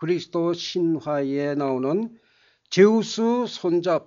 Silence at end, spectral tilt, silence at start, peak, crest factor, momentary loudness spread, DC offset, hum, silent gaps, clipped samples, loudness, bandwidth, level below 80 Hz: 0.05 s; -5 dB/octave; 0 s; -4 dBFS; 20 dB; 8 LU; under 0.1%; none; none; under 0.1%; -23 LUFS; 7.6 kHz; -72 dBFS